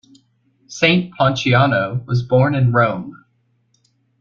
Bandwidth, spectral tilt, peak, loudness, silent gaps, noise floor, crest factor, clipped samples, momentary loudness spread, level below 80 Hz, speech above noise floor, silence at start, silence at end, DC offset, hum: 7.2 kHz; -6.5 dB/octave; -2 dBFS; -16 LUFS; none; -63 dBFS; 16 dB; under 0.1%; 10 LU; -52 dBFS; 47 dB; 0.7 s; 1.05 s; under 0.1%; none